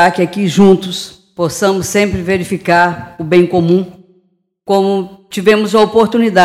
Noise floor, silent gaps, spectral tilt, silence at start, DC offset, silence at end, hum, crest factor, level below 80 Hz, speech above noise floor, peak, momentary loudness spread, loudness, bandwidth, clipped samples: -58 dBFS; none; -5.5 dB/octave; 0 s; under 0.1%; 0 s; none; 12 dB; -42 dBFS; 46 dB; 0 dBFS; 12 LU; -12 LUFS; 15.5 kHz; under 0.1%